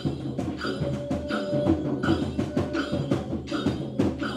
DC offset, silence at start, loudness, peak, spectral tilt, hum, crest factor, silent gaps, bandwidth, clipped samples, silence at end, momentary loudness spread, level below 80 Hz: under 0.1%; 0 s; -28 LUFS; -10 dBFS; -7 dB/octave; none; 18 dB; none; 12 kHz; under 0.1%; 0 s; 5 LU; -46 dBFS